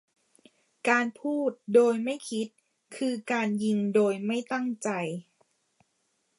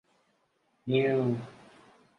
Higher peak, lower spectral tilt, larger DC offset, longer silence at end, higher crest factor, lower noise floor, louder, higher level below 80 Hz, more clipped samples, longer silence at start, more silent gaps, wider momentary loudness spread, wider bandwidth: first, -8 dBFS vs -14 dBFS; second, -5.5 dB/octave vs -8.5 dB/octave; neither; first, 1.15 s vs 0.65 s; about the same, 20 dB vs 18 dB; about the same, -75 dBFS vs -73 dBFS; about the same, -28 LUFS vs -29 LUFS; second, -80 dBFS vs -72 dBFS; neither; about the same, 0.85 s vs 0.85 s; neither; second, 11 LU vs 19 LU; first, 11.5 kHz vs 6.6 kHz